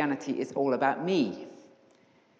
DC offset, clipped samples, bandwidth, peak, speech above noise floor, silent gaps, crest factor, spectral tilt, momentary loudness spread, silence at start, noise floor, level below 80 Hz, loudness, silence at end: under 0.1%; under 0.1%; 8 kHz; -14 dBFS; 34 dB; none; 18 dB; -6 dB/octave; 12 LU; 0 s; -63 dBFS; -82 dBFS; -29 LUFS; 0.85 s